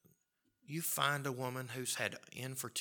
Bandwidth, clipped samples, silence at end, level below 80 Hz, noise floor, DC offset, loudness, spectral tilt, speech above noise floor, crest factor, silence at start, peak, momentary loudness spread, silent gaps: 19 kHz; under 0.1%; 0 s; -86 dBFS; -80 dBFS; under 0.1%; -38 LUFS; -3 dB/octave; 41 dB; 24 dB; 0.7 s; -16 dBFS; 10 LU; none